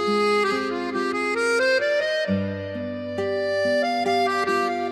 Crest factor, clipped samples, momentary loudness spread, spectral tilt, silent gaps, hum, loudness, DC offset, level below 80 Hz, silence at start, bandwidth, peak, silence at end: 12 dB; under 0.1%; 8 LU; -4.5 dB/octave; none; none; -23 LUFS; under 0.1%; -68 dBFS; 0 s; 14 kHz; -10 dBFS; 0 s